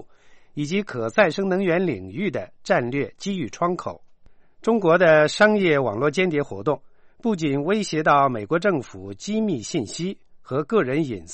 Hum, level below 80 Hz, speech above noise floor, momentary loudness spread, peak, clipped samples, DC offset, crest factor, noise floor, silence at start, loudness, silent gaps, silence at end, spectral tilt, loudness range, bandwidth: none; -58 dBFS; 27 dB; 13 LU; -4 dBFS; under 0.1%; under 0.1%; 18 dB; -49 dBFS; 0 s; -22 LUFS; none; 0 s; -5.5 dB/octave; 4 LU; 8.8 kHz